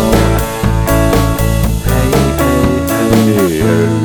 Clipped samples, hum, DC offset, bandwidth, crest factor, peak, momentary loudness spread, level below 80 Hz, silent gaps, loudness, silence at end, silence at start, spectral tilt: under 0.1%; none; under 0.1%; over 20 kHz; 10 dB; 0 dBFS; 3 LU; -18 dBFS; none; -12 LUFS; 0 s; 0 s; -6 dB/octave